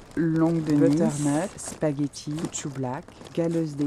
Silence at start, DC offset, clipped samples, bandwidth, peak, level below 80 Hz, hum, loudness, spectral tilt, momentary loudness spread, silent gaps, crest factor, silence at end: 0 s; under 0.1%; under 0.1%; 13 kHz; -8 dBFS; -56 dBFS; none; -26 LUFS; -6.5 dB/octave; 11 LU; none; 18 dB; 0 s